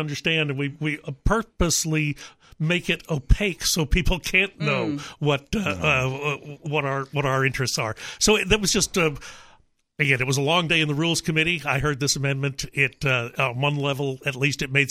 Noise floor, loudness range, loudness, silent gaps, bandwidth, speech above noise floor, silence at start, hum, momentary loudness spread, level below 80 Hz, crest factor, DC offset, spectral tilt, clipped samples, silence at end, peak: -57 dBFS; 2 LU; -23 LUFS; none; 16 kHz; 34 dB; 0 s; none; 7 LU; -34 dBFS; 20 dB; under 0.1%; -4 dB/octave; under 0.1%; 0 s; -4 dBFS